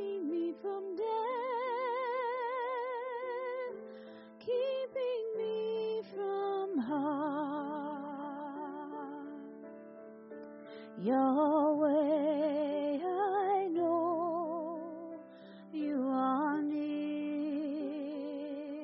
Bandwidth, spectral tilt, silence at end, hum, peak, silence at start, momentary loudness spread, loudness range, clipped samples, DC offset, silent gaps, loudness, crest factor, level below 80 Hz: 5.6 kHz; -4.5 dB/octave; 0 s; none; -20 dBFS; 0 s; 18 LU; 7 LU; under 0.1%; under 0.1%; none; -35 LUFS; 16 dB; -84 dBFS